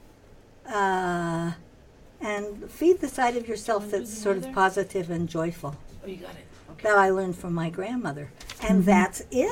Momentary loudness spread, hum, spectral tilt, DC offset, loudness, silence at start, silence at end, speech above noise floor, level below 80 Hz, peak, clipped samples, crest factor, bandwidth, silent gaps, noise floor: 18 LU; none; -6 dB/octave; under 0.1%; -26 LUFS; 0.65 s; 0 s; 27 dB; -50 dBFS; -10 dBFS; under 0.1%; 18 dB; 16.5 kHz; none; -52 dBFS